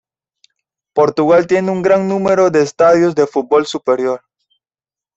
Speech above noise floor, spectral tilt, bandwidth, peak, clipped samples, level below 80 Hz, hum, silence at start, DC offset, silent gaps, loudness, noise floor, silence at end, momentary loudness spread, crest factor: over 77 dB; -6 dB/octave; 8.2 kHz; -2 dBFS; under 0.1%; -56 dBFS; none; 0.95 s; under 0.1%; none; -13 LUFS; under -90 dBFS; 1 s; 6 LU; 14 dB